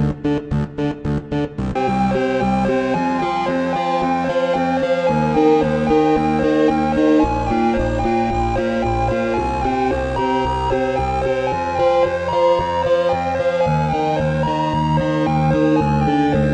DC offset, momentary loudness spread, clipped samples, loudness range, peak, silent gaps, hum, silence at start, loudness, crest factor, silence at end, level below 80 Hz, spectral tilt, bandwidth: under 0.1%; 4 LU; under 0.1%; 3 LU; -4 dBFS; none; none; 0 s; -18 LUFS; 14 dB; 0 s; -32 dBFS; -7.5 dB/octave; 9.2 kHz